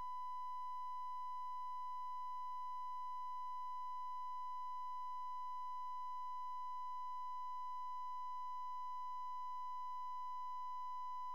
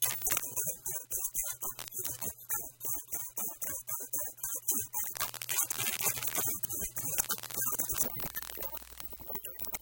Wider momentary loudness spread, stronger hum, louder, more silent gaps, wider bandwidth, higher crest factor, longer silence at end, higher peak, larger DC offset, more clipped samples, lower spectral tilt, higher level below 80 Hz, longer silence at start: second, 0 LU vs 8 LU; first, 50 Hz at -95 dBFS vs none; second, -47 LUFS vs -33 LUFS; neither; about the same, 17 kHz vs 17.5 kHz; second, 4 dB vs 26 dB; about the same, 0 s vs 0 s; second, -40 dBFS vs -10 dBFS; first, 0.3% vs under 0.1%; neither; about the same, -1 dB/octave vs -0.5 dB/octave; second, under -90 dBFS vs -60 dBFS; about the same, 0 s vs 0 s